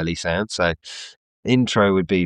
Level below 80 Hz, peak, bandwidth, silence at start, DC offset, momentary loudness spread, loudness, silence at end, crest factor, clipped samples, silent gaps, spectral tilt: -50 dBFS; -4 dBFS; 11 kHz; 0 s; under 0.1%; 17 LU; -20 LUFS; 0 s; 18 dB; under 0.1%; 1.16-1.43 s; -5.5 dB/octave